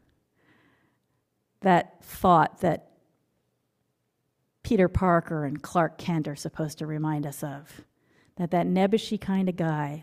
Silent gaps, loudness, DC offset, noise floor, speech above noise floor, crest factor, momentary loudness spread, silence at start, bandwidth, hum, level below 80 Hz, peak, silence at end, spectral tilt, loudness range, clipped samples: none; -26 LUFS; under 0.1%; -76 dBFS; 51 dB; 20 dB; 13 LU; 1.6 s; 15.5 kHz; none; -52 dBFS; -8 dBFS; 0 s; -7 dB/octave; 3 LU; under 0.1%